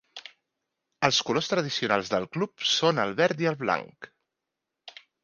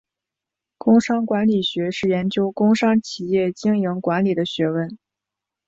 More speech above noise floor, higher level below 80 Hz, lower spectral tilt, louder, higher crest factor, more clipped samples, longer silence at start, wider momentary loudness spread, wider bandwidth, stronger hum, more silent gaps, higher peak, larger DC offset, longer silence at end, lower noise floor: second, 59 dB vs 67 dB; second, -68 dBFS vs -62 dBFS; second, -3.5 dB/octave vs -6.5 dB/octave; second, -26 LUFS vs -20 LUFS; first, 24 dB vs 16 dB; neither; second, 0.15 s vs 0.85 s; first, 21 LU vs 6 LU; first, 10 kHz vs 7.8 kHz; neither; neither; about the same, -4 dBFS vs -4 dBFS; neither; second, 0.35 s vs 0.7 s; about the same, -85 dBFS vs -86 dBFS